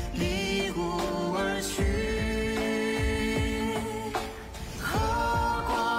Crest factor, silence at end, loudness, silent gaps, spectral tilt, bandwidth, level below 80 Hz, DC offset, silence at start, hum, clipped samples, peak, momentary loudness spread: 12 dB; 0 s; -29 LUFS; none; -5 dB/octave; 16 kHz; -38 dBFS; under 0.1%; 0 s; none; under 0.1%; -18 dBFS; 6 LU